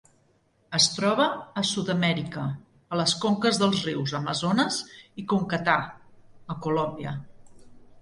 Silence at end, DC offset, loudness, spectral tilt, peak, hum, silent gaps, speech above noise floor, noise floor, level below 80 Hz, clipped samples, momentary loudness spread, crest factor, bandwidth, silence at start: 0 s; under 0.1%; -26 LUFS; -4 dB/octave; -6 dBFS; none; none; 39 dB; -65 dBFS; -62 dBFS; under 0.1%; 13 LU; 22 dB; 11.5 kHz; 0.7 s